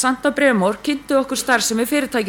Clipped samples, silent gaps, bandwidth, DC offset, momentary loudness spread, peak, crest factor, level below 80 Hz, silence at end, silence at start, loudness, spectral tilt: under 0.1%; none; 18 kHz; under 0.1%; 4 LU; -2 dBFS; 16 dB; -52 dBFS; 0 s; 0 s; -18 LUFS; -3.5 dB/octave